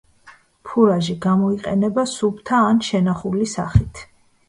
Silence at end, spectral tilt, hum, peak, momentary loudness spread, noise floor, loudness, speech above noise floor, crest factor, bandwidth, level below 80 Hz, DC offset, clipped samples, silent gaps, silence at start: 0.45 s; -6.5 dB/octave; none; 0 dBFS; 6 LU; -49 dBFS; -19 LUFS; 31 dB; 18 dB; 11 kHz; -38 dBFS; under 0.1%; under 0.1%; none; 0.25 s